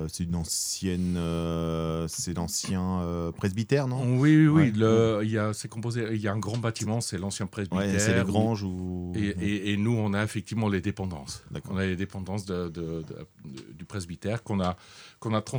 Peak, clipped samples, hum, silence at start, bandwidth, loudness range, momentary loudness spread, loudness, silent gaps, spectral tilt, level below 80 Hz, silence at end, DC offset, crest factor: -8 dBFS; under 0.1%; none; 0 s; over 20 kHz; 9 LU; 15 LU; -28 LUFS; none; -5.5 dB/octave; -52 dBFS; 0 s; under 0.1%; 18 dB